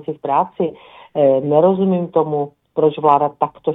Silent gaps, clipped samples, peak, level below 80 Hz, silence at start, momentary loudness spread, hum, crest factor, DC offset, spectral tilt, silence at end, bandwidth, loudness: none; under 0.1%; 0 dBFS; -62 dBFS; 0.1 s; 10 LU; none; 16 dB; under 0.1%; -11 dB/octave; 0 s; 4 kHz; -17 LUFS